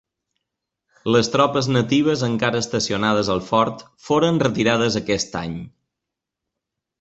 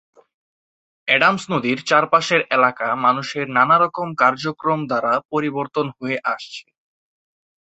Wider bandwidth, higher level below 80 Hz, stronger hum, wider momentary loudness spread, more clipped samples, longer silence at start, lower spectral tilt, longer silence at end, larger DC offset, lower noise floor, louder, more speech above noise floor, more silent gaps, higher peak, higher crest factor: about the same, 8.2 kHz vs 8.2 kHz; first, -52 dBFS vs -66 dBFS; neither; about the same, 9 LU vs 9 LU; neither; about the same, 1.05 s vs 1.05 s; about the same, -5 dB/octave vs -4.5 dB/octave; first, 1.35 s vs 1.1 s; neither; second, -84 dBFS vs under -90 dBFS; about the same, -20 LUFS vs -18 LUFS; second, 64 dB vs over 71 dB; second, none vs 5.25-5.29 s; about the same, -2 dBFS vs -2 dBFS; about the same, 18 dB vs 18 dB